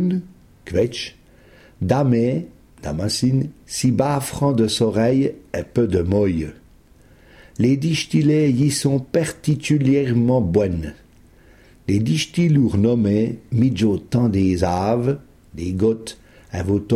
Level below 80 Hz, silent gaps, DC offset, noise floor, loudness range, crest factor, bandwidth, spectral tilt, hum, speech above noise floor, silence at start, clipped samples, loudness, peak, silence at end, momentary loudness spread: -44 dBFS; none; under 0.1%; -50 dBFS; 3 LU; 16 dB; 15.5 kHz; -6.5 dB/octave; none; 31 dB; 0 s; under 0.1%; -20 LUFS; -4 dBFS; 0 s; 12 LU